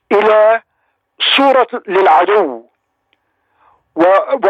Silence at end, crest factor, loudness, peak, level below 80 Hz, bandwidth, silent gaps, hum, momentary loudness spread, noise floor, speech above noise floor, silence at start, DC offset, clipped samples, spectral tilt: 0 s; 12 dB; -11 LUFS; 0 dBFS; -66 dBFS; 8.8 kHz; none; none; 10 LU; -65 dBFS; 54 dB; 0.1 s; under 0.1%; under 0.1%; -4.5 dB/octave